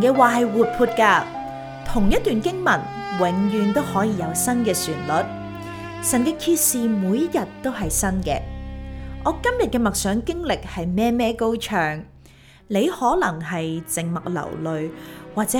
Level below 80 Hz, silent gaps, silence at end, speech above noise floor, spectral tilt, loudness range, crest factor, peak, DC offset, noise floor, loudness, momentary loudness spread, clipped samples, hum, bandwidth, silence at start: -38 dBFS; none; 0 s; 28 dB; -4.5 dB/octave; 3 LU; 20 dB; -2 dBFS; under 0.1%; -48 dBFS; -21 LUFS; 13 LU; under 0.1%; none; over 20 kHz; 0 s